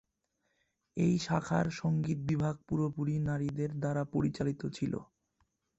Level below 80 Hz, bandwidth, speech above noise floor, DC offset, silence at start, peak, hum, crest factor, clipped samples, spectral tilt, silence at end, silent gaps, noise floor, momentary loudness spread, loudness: -60 dBFS; 8.2 kHz; 48 dB; under 0.1%; 0.95 s; -16 dBFS; none; 18 dB; under 0.1%; -7.5 dB/octave; 0.75 s; none; -81 dBFS; 6 LU; -34 LUFS